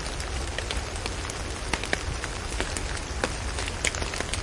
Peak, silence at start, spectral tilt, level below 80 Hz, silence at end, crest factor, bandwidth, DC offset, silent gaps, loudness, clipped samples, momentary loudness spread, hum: -6 dBFS; 0 s; -3 dB/octave; -36 dBFS; 0 s; 24 dB; 11.5 kHz; under 0.1%; none; -30 LUFS; under 0.1%; 5 LU; none